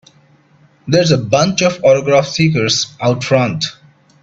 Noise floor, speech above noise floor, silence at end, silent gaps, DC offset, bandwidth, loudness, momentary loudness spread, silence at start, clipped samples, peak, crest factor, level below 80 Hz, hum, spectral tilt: -50 dBFS; 37 dB; 0.5 s; none; under 0.1%; 8 kHz; -14 LUFS; 6 LU; 0.85 s; under 0.1%; 0 dBFS; 14 dB; -50 dBFS; none; -4.5 dB/octave